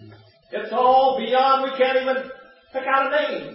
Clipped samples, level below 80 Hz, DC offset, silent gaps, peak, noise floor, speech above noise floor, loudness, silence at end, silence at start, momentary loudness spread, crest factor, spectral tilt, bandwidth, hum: under 0.1%; -64 dBFS; under 0.1%; none; -6 dBFS; -47 dBFS; 28 dB; -20 LUFS; 0 s; 0 s; 15 LU; 16 dB; -8 dB/octave; 5.8 kHz; none